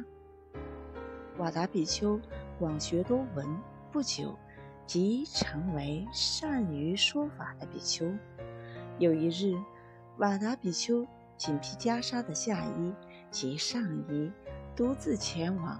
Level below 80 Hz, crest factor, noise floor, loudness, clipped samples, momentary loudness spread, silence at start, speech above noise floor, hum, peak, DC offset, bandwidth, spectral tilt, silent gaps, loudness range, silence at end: -54 dBFS; 18 dB; -54 dBFS; -33 LUFS; under 0.1%; 15 LU; 0 s; 21 dB; none; -14 dBFS; under 0.1%; 11 kHz; -4.5 dB/octave; none; 3 LU; 0 s